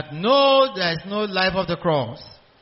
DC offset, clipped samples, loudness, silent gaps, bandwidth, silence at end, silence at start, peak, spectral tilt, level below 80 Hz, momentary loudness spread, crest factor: under 0.1%; under 0.1%; -20 LUFS; none; 6 kHz; 0.35 s; 0 s; -6 dBFS; -2.5 dB/octave; -52 dBFS; 10 LU; 16 dB